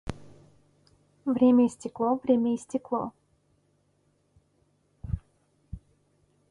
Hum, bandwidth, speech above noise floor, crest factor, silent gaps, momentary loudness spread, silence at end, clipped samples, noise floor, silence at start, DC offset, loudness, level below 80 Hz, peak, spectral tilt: none; 11 kHz; 45 dB; 18 dB; none; 26 LU; 0.75 s; under 0.1%; -69 dBFS; 0.05 s; under 0.1%; -27 LUFS; -50 dBFS; -12 dBFS; -7.5 dB/octave